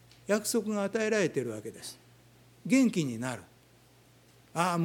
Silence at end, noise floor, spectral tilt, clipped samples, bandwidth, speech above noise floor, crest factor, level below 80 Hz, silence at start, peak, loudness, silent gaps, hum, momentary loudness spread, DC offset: 0 s; -60 dBFS; -5 dB/octave; under 0.1%; 18.5 kHz; 31 dB; 20 dB; -72 dBFS; 0.3 s; -12 dBFS; -30 LUFS; none; none; 17 LU; under 0.1%